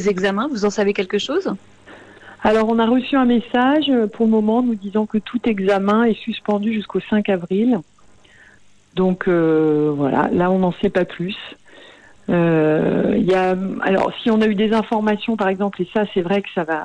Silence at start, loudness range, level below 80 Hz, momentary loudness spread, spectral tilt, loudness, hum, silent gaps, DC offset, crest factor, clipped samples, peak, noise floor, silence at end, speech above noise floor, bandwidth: 0 s; 2 LU; -50 dBFS; 6 LU; -7 dB/octave; -18 LUFS; none; none; under 0.1%; 12 dB; under 0.1%; -6 dBFS; -51 dBFS; 0 s; 33 dB; 9.2 kHz